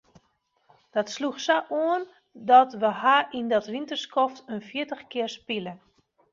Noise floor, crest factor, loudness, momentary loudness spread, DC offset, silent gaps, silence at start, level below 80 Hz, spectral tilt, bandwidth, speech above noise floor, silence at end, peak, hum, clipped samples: -71 dBFS; 20 dB; -25 LUFS; 14 LU; under 0.1%; none; 0.95 s; -74 dBFS; -4 dB/octave; 7.4 kHz; 46 dB; 0.55 s; -6 dBFS; none; under 0.1%